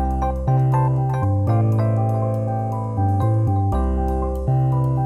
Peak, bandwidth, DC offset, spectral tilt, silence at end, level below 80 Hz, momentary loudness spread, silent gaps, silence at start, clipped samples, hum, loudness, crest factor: -8 dBFS; 4.1 kHz; under 0.1%; -10.5 dB/octave; 0 s; -28 dBFS; 5 LU; none; 0 s; under 0.1%; none; -20 LUFS; 10 dB